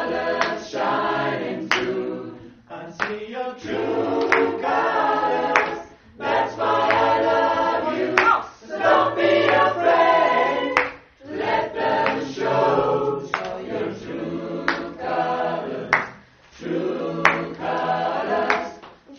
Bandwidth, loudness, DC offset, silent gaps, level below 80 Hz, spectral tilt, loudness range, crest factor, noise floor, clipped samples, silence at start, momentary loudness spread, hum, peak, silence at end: 7 kHz; -21 LUFS; under 0.1%; none; -58 dBFS; -5 dB/octave; 7 LU; 22 dB; -47 dBFS; under 0.1%; 0 s; 11 LU; none; 0 dBFS; 0 s